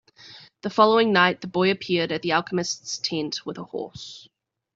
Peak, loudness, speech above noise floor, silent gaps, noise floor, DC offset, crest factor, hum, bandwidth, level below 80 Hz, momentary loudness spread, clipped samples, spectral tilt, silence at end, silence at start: -4 dBFS; -23 LUFS; 25 dB; none; -48 dBFS; under 0.1%; 22 dB; none; 8 kHz; -66 dBFS; 16 LU; under 0.1%; -4 dB/octave; 0.55 s; 0.25 s